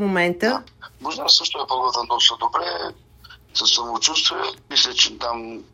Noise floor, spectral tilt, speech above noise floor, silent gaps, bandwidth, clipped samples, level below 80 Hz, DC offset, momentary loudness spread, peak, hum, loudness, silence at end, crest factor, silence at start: -47 dBFS; -1.5 dB/octave; 26 dB; none; 16 kHz; under 0.1%; -56 dBFS; under 0.1%; 13 LU; -2 dBFS; none; -19 LUFS; 0.1 s; 20 dB; 0 s